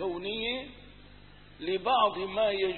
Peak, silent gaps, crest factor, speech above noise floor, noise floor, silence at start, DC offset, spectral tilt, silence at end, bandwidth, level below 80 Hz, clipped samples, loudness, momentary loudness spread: -14 dBFS; none; 18 dB; 25 dB; -53 dBFS; 0 s; 0.1%; -8 dB/octave; 0 s; 4.4 kHz; -58 dBFS; under 0.1%; -30 LUFS; 12 LU